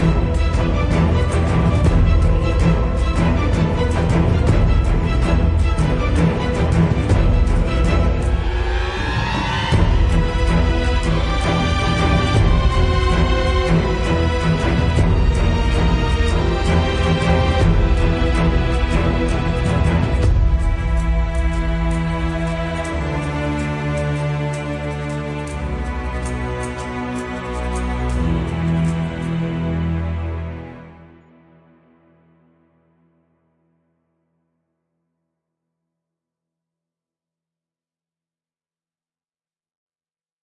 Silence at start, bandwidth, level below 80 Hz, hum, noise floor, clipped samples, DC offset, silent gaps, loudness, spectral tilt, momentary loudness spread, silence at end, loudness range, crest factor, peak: 0 s; 11 kHz; -22 dBFS; none; under -90 dBFS; under 0.1%; under 0.1%; none; -19 LUFS; -7 dB/octave; 8 LU; 9.5 s; 7 LU; 16 dB; -2 dBFS